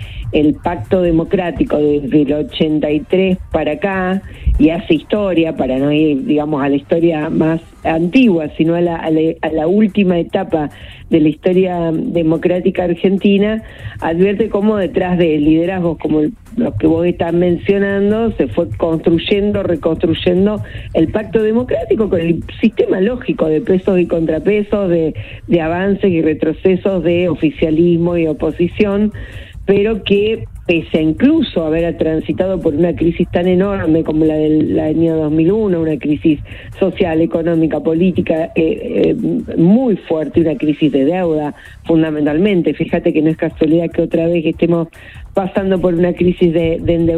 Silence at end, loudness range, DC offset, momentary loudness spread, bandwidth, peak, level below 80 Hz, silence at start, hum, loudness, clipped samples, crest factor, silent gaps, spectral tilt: 0 s; 1 LU; under 0.1%; 5 LU; 5.4 kHz; 0 dBFS; -34 dBFS; 0 s; none; -14 LUFS; under 0.1%; 14 dB; none; -9 dB/octave